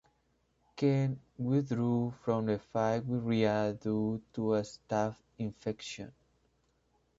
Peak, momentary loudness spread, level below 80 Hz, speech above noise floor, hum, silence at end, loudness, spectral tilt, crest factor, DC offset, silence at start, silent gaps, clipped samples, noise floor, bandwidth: -14 dBFS; 11 LU; -66 dBFS; 42 dB; none; 1.1 s; -33 LUFS; -7.5 dB/octave; 20 dB; under 0.1%; 0.75 s; none; under 0.1%; -74 dBFS; 7.8 kHz